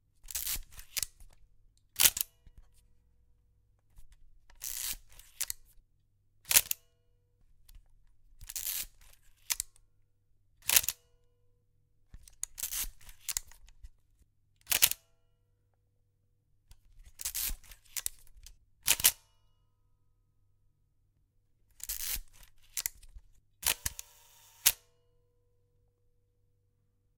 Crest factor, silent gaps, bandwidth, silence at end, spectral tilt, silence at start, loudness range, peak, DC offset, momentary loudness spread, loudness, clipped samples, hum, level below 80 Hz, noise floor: 38 dB; none; 19 kHz; 2.45 s; 1.5 dB/octave; 0.25 s; 9 LU; 0 dBFS; under 0.1%; 18 LU; -31 LUFS; under 0.1%; none; -56 dBFS; -73 dBFS